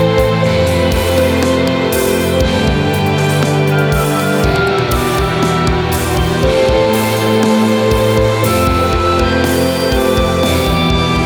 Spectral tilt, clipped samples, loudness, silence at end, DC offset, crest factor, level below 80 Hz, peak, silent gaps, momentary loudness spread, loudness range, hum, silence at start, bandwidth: -5.5 dB/octave; under 0.1%; -13 LUFS; 0 s; under 0.1%; 12 dB; -24 dBFS; 0 dBFS; none; 2 LU; 1 LU; none; 0 s; over 20 kHz